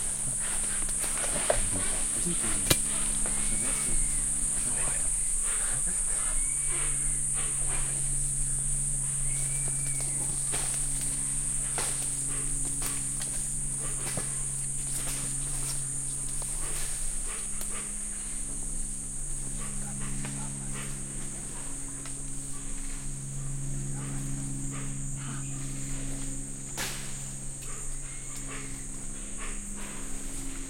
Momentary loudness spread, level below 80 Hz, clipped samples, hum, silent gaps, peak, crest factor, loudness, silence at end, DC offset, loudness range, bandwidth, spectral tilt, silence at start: 11 LU; -38 dBFS; under 0.1%; none; none; -4 dBFS; 26 dB; -30 LUFS; 0 s; under 0.1%; 10 LU; 16.5 kHz; -2 dB/octave; 0 s